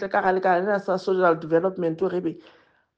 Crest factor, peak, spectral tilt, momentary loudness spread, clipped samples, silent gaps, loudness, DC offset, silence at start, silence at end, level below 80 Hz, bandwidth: 16 dB; -8 dBFS; -7.5 dB/octave; 7 LU; under 0.1%; none; -23 LUFS; under 0.1%; 0 s; 0.6 s; -68 dBFS; 7.6 kHz